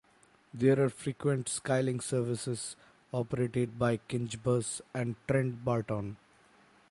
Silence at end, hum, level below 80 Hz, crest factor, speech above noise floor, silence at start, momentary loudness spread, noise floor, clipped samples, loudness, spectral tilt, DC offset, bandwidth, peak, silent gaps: 0.75 s; none; -64 dBFS; 18 dB; 33 dB; 0.55 s; 9 LU; -65 dBFS; under 0.1%; -32 LUFS; -6 dB/octave; under 0.1%; 11.5 kHz; -14 dBFS; none